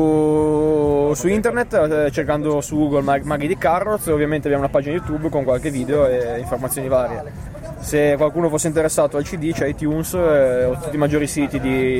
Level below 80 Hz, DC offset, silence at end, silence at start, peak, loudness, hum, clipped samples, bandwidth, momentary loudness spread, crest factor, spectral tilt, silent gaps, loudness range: -38 dBFS; under 0.1%; 0 s; 0 s; -6 dBFS; -19 LUFS; none; under 0.1%; 16.5 kHz; 6 LU; 12 dB; -6 dB/octave; none; 2 LU